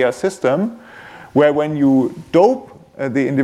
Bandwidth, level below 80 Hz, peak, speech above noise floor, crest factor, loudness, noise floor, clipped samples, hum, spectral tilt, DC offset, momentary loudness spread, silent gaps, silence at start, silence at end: 12 kHz; -58 dBFS; 0 dBFS; 23 dB; 16 dB; -17 LUFS; -38 dBFS; under 0.1%; none; -7 dB/octave; under 0.1%; 11 LU; none; 0 s; 0 s